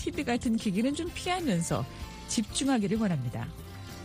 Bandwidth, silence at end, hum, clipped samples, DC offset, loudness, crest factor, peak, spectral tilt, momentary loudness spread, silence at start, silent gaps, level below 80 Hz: 15.5 kHz; 0 s; none; under 0.1%; under 0.1%; -30 LUFS; 16 dB; -16 dBFS; -5 dB/octave; 12 LU; 0 s; none; -48 dBFS